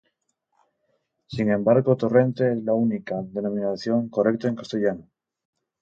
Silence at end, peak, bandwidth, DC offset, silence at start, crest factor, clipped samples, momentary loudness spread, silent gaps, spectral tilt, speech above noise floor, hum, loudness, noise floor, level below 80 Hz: 0.8 s; -6 dBFS; 7.4 kHz; under 0.1%; 1.3 s; 18 dB; under 0.1%; 9 LU; none; -8.5 dB/octave; 52 dB; none; -23 LUFS; -74 dBFS; -62 dBFS